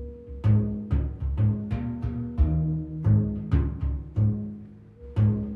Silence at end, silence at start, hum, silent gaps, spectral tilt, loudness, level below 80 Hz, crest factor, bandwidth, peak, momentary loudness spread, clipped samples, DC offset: 0 s; 0 s; none; none; -11.5 dB/octave; -27 LUFS; -32 dBFS; 14 dB; 3.3 kHz; -10 dBFS; 10 LU; under 0.1%; under 0.1%